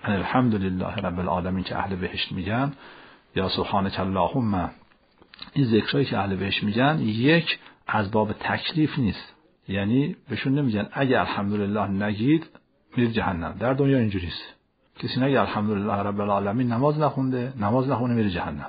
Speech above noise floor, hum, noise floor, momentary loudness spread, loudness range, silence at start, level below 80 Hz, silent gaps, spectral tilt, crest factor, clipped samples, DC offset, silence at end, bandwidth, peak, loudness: 34 dB; none; -58 dBFS; 7 LU; 3 LU; 0.05 s; -52 dBFS; none; -5 dB/octave; 18 dB; under 0.1%; under 0.1%; 0 s; 5 kHz; -6 dBFS; -25 LUFS